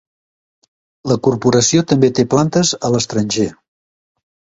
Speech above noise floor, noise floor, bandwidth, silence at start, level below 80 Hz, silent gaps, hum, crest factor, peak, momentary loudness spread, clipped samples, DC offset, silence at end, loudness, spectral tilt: over 76 dB; under -90 dBFS; 8 kHz; 1.05 s; -50 dBFS; none; none; 16 dB; 0 dBFS; 7 LU; under 0.1%; under 0.1%; 1.05 s; -15 LUFS; -5 dB/octave